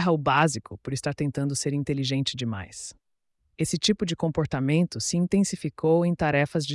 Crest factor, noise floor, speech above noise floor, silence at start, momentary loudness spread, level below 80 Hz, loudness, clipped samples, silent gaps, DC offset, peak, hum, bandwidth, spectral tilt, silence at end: 16 dB; -74 dBFS; 48 dB; 0 s; 10 LU; -54 dBFS; -26 LUFS; under 0.1%; none; under 0.1%; -10 dBFS; none; 12 kHz; -5 dB/octave; 0 s